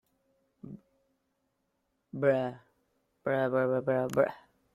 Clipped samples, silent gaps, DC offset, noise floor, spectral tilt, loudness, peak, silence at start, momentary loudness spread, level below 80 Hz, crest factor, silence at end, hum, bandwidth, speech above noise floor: under 0.1%; none; under 0.1%; -79 dBFS; -7.5 dB/octave; -30 LUFS; -14 dBFS; 0.65 s; 20 LU; -72 dBFS; 20 dB; 0.35 s; none; 15 kHz; 50 dB